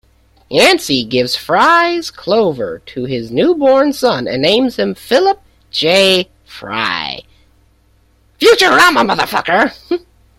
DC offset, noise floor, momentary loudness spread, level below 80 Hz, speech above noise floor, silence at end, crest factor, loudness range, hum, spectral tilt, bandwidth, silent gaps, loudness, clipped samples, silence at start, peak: under 0.1%; -52 dBFS; 13 LU; -48 dBFS; 40 dB; 0.4 s; 14 dB; 2 LU; none; -3.5 dB/octave; 16.5 kHz; none; -12 LUFS; under 0.1%; 0.5 s; 0 dBFS